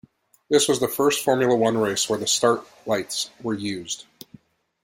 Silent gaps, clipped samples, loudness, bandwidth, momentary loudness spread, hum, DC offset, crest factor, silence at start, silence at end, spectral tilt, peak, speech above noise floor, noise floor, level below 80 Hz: none; under 0.1%; -22 LUFS; 16.5 kHz; 9 LU; none; under 0.1%; 18 dB; 0.5 s; 0.8 s; -3 dB/octave; -4 dBFS; 30 dB; -52 dBFS; -64 dBFS